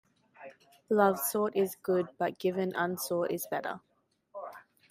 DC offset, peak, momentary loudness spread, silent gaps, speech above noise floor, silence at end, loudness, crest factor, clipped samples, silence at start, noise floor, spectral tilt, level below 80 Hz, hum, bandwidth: under 0.1%; -10 dBFS; 22 LU; none; 22 dB; 0.3 s; -31 LUFS; 22 dB; under 0.1%; 0.4 s; -53 dBFS; -5 dB/octave; -78 dBFS; none; 16 kHz